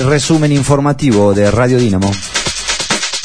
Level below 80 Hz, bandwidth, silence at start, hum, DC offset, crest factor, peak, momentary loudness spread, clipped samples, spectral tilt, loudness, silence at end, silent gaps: -34 dBFS; 10.5 kHz; 0 s; none; 2%; 12 dB; 0 dBFS; 5 LU; under 0.1%; -5 dB/octave; -12 LUFS; 0 s; none